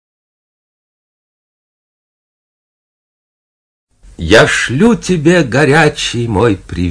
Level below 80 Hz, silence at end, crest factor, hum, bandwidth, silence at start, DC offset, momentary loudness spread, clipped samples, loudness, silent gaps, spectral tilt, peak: -36 dBFS; 0 s; 14 dB; none; 11 kHz; 4.2 s; under 0.1%; 7 LU; 0.7%; -10 LUFS; none; -5 dB/octave; 0 dBFS